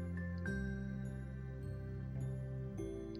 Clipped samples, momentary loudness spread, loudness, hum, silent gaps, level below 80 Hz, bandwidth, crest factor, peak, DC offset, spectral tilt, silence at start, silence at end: under 0.1%; 5 LU; -44 LUFS; none; none; -52 dBFS; 12 kHz; 14 dB; -28 dBFS; under 0.1%; -8.5 dB/octave; 0 s; 0 s